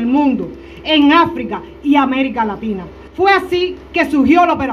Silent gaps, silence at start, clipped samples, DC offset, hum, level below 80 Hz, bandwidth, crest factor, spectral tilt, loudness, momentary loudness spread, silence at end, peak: none; 0 s; under 0.1%; under 0.1%; none; -42 dBFS; 11 kHz; 14 dB; -6 dB/octave; -14 LUFS; 14 LU; 0 s; 0 dBFS